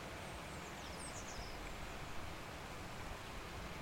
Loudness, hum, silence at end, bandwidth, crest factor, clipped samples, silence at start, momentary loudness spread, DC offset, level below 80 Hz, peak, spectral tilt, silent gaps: -48 LUFS; none; 0 s; 16.5 kHz; 14 dB; under 0.1%; 0 s; 2 LU; under 0.1%; -56 dBFS; -34 dBFS; -3.5 dB/octave; none